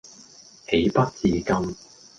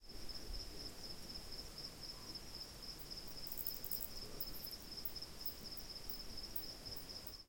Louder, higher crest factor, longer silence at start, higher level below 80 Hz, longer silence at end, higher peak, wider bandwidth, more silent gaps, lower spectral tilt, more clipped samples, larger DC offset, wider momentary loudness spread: first, -23 LUFS vs -47 LUFS; second, 18 dB vs 24 dB; about the same, 0.05 s vs 0 s; first, -46 dBFS vs -58 dBFS; first, 0.45 s vs 0 s; first, -6 dBFS vs -24 dBFS; second, 9.4 kHz vs 17 kHz; neither; first, -6 dB/octave vs -2.5 dB/octave; neither; neither; first, 17 LU vs 7 LU